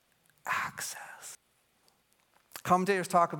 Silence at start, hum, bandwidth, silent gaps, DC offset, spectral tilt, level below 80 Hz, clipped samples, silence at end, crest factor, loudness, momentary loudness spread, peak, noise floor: 0.45 s; none; 17.5 kHz; none; under 0.1%; -4.5 dB/octave; -74 dBFS; under 0.1%; 0 s; 22 dB; -31 LUFS; 20 LU; -10 dBFS; -71 dBFS